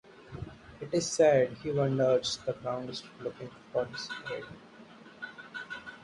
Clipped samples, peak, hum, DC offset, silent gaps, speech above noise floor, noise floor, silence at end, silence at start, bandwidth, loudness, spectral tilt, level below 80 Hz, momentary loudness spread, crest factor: under 0.1%; -12 dBFS; none; under 0.1%; none; 22 dB; -52 dBFS; 0 s; 0.15 s; 11.5 kHz; -31 LUFS; -4.5 dB/octave; -62 dBFS; 21 LU; 20 dB